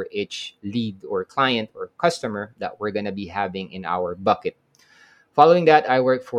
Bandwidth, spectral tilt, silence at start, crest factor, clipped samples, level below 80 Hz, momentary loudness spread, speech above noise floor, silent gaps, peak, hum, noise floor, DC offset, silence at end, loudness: 11 kHz; -5.5 dB/octave; 0 s; 22 dB; under 0.1%; -66 dBFS; 15 LU; 33 dB; none; 0 dBFS; none; -55 dBFS; under 0.1%; 0 s; -22 LUFS